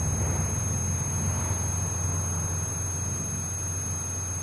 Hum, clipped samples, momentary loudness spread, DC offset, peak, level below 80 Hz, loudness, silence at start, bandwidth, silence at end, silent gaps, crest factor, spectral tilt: none; under 0.1%; 3 LU; under 0.1%; -16 dBFS; -42 dBFS; -28 LUFS; 0 s; 11 kHz; 0 s; none; 12 dB; -4.5 dB/octave